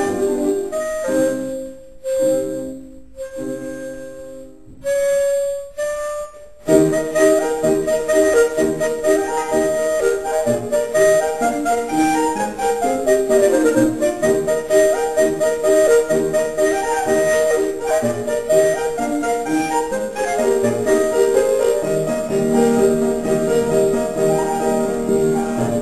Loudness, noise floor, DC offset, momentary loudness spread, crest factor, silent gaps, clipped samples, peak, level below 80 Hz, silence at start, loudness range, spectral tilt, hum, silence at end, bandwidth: -18 LUFS; -39 dBFS; 0.7%; 12 LU; 16 dB; none; under 0.1%; -2 dBFS; -48 dBFS; 0 s; 7 LU; -4.5 dB/octave; none; 0 s; 13.5 kHz